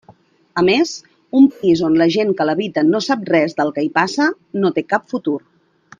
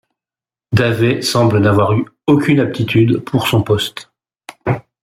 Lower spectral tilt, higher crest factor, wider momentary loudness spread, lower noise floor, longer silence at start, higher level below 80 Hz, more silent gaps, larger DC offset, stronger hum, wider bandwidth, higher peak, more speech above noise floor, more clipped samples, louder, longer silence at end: about the same, -5.5 dB/octave vs -6 dB/octave; about the same, 16 dB vs 14 dB; about the same, 9 LU vs 9 LU; second, -50 dBFS vs under -90 dBFS; second, 0.1 s vs 0.7 s; second, -60 dBFS vs -46 dBFS; neither; neither; neither; second, 9.2 kHz vs 16 kHz; about the same, 0 dBFS vs -2 dBFS; second, 34 dB vs over 76 dB; neither; about the same, -17 LUFS vs -15 LUFS; first, 0.6 s vs 0.25 s